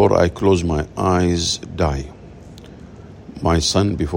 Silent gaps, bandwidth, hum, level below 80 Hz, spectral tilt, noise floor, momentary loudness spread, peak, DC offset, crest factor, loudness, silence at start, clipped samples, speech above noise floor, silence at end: none; 16 kHz; none; -36 dBFS; -5 dB/octave; -39 dBFS; 23 LU; -2 dBFS; under 0.1%; 18 dB; -18 LUFS; 0 s; under 0.1%; 21 dB; 0 s